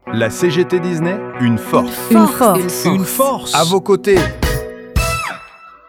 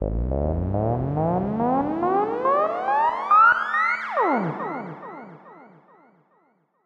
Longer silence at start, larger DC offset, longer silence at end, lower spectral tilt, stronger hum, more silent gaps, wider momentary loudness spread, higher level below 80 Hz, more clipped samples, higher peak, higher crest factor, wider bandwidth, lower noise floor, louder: about the same, 0.05 s vs 0 s; neither; second, 0.2 s vs 1.2 s; second, -5 dB/octave vs -8.5 dB/octave; neither; neither; second, 8 LU vs 15 LU; first, -30 dBFS vs -38 dBFS; neither; first, 0 dBFS vs -6 dBFS; about the same, 14 dB vs 16 dB; first, 18.5 kHz vs 7.8 kHz; second, -39 dBFS vs -65 dBFS; first, -15 LUFS vs -22 LUFS